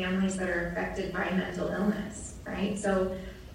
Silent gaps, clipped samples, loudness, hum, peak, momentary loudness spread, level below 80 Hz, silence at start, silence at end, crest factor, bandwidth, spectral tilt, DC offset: none; under 0.1%; -31 LUFS; none; -14 dBFS; 9 LU; -48 dBFS; 0 s; 0 s; 16 dB; 14.5 kHz; -5.5 dB/octave; under 0.1%